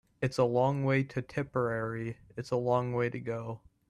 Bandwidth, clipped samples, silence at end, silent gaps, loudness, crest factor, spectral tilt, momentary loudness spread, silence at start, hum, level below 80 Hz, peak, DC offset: 11.5 kHz; under 0.1%; 0.35 s; none; -32 LUFS; 18 dB; -7.5 dB/octave; 11 LU; 0.2 s; none; -64 dBFS; -14 dBFS; under 0.1%